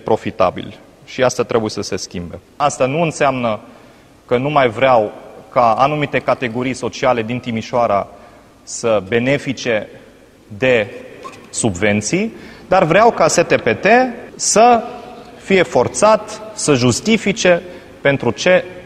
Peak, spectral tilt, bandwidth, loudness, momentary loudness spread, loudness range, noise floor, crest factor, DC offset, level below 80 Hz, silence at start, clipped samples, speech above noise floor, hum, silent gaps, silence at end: 0 dBFS; -4 dB/octave; 13.5 kHz; -15 LUFS; 16 LU; 6 LU; -44 dBFS; 16 dB; under 0.1%; -48 dBFS; 0.05 s; under 0.1%; 29 dB; none; none; 0 s